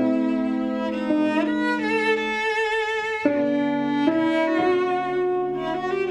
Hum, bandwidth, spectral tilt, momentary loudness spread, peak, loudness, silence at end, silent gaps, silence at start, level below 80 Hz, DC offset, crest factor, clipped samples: none; 10.5 kHz; -5.5 dB/octave; 4 LU; -6 dBFS; -23 LUFS; 0 s; none; 0 s; -58 dBFS; under 0.1%; 16 dB; under 0.1%